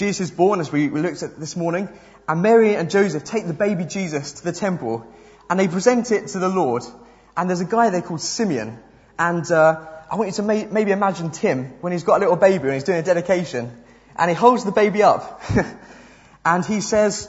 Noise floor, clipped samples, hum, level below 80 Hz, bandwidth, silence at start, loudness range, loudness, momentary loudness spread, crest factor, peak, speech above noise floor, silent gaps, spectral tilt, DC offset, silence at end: -47 dBFS; under 0.1%; none; -52 dBFS; 8 kHz; 0 s; 3 LU; -20 LUFS; 12 LU; 20 dB; 0 dBFS; 27 dB; none; -5.5 dB/octave; under 0.1%; 0 s